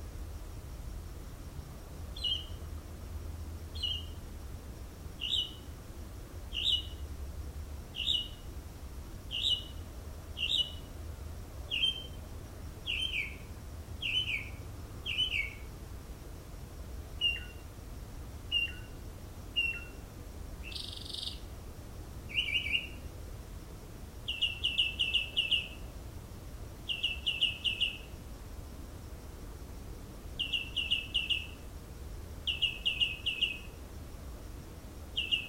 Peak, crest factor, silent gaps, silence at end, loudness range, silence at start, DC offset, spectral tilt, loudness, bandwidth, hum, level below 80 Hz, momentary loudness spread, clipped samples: -18 dBFS; 20 dB; none; 0 s; 6 LU; 0 s; under 0.1%; -2.5 dB/octave; -33 LUFS; 16 kHz; none; -46 dBFS; 18 LU; under 0.1%